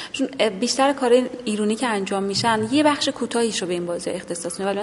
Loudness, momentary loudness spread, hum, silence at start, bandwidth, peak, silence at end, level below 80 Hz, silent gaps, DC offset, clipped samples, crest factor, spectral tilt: -22 LUFS; 8 LU; none; 0 s; 11.5 kHz; -4 dBFS; 0 s; -60 dBFS; none; under 0.1%; under 0.1%; 16 dB; -3.5 dB/octave